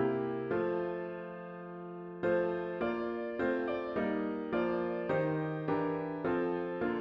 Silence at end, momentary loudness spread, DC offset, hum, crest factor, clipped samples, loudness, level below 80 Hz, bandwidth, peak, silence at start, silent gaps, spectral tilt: 0 s; 11 LU; under 0.1%; none; 14 dB; under 0.1%; -35 LUFS; -66 dBFS; 5.8 kHz; -20 dBFS; 0 s; none; -9.5 dB/octave